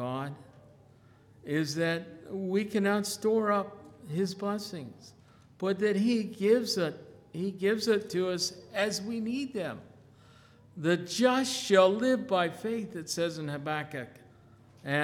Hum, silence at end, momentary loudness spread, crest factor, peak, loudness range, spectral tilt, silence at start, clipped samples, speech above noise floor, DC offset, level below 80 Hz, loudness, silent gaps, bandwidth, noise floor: none; 0 s; 15 LU; 22 dB; -10 dBFS; 4 LU; -4.5 dB/octave; 0 s; under 0.1%; 29 dB; under 0.1%; -72 dBFS; -30 LUFS; none; 18 kHz; -58 dBFS